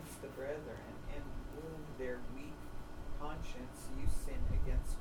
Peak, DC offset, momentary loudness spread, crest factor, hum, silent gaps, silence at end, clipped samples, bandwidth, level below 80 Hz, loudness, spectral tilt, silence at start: -22 dBFS; under 0.1%; 9 LU; 16 dB; none; none; 0 s; under 0.1%; 15.5 kHz; -42 dBFS; -45 LUFS; -6 dB/octave; 0 s